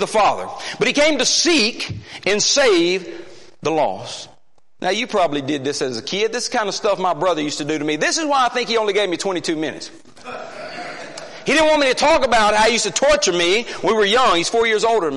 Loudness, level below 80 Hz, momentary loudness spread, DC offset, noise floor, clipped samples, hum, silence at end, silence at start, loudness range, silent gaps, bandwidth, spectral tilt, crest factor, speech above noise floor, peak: -17 LUFS; -48 dBFS; 16 LU; under 0.1%; -57 dBFS; under 0.1%; none; 0 s; 0 s; 6 LU; none; 11.5 kHz; -2.5 dB/octave; 14 dB; 39 dB; -4 dBFS